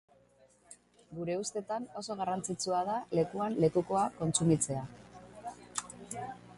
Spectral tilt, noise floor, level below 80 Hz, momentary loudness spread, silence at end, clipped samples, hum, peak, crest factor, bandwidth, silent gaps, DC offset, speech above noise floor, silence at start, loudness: -5 dB/octave; -65 dBFS; -66 dBFS; 18 LU; 0 s; under 0.1%; 60 Hz at -60 dBFS; -14 dBFS; 20 dB; 11.5 kHz; none; under 0.1%; 32 dB; 0.7 s; -33 LUFS